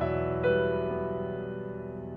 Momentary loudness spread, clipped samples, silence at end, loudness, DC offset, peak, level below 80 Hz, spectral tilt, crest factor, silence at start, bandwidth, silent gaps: 11 LU; under 0.1%; 0 s; -31 LUFS; under 0.1%; -14 dBFS; -50 dBFS; -10 dB/octave; 16 dB; 0 s; 4.9 kHz; none